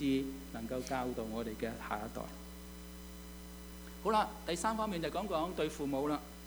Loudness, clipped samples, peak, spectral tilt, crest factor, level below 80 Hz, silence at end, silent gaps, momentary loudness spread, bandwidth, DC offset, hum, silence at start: -38 LUFS; under 0.1%; -18 dBFS; -5 dB/octave; 20 dB; -54 dBFS; 0 s; none; 16 LU; over 20 kHz; under 0.1%; none; 0 s